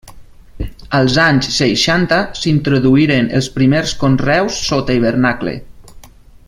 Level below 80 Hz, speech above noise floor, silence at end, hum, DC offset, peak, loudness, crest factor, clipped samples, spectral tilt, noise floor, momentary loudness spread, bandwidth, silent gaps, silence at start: -34 dBFS; 26 dB; 0.45 s; none; under 0.1%; 0 dBFS; -14 LUFS; 14 dB; under 0.1%; -5 dB/octave; -39 dBFS; 10 LU; 12.5 kHz; none; 0.05 s